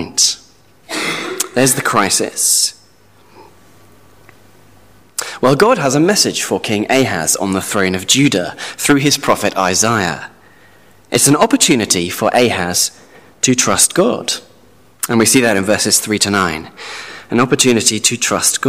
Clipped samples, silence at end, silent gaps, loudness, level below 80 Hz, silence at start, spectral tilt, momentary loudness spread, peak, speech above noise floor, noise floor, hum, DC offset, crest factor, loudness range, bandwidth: under 0.1%; 0 s; none; -13 LUFS; -50 dBFS; 0 s; -2.5 dB/octave; 10 LU; 0 dBFS; 35 dB; -49 dBFS; none; 0.4%; 16 dB; 4 LU; 16 kHz